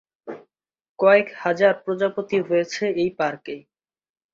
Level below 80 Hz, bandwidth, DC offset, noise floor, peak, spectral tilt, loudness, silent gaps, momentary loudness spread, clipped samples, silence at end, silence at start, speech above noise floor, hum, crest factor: -68 dBFS; 7.6 kHz; under 0.1%; -63 dBFS; -4 dBFS; -5.5 dB/octave; -21 LUFS; 0.89-0.95 s; 22 LU; under 0.1%; 0.75 s; 0.25 s; 42 dB; none; 20 dB